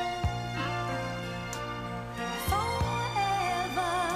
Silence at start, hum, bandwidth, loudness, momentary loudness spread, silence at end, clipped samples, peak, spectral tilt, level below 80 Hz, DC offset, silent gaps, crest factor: 0 s; 60 Hz at -55 dBFS; 15.5 kHz; -31 LUFS; 7 LU; 0 s; under 0.1%; -16 dBFS; -4.5 dB/octave; -44 dBFS; under 0.1%; none; 16 dB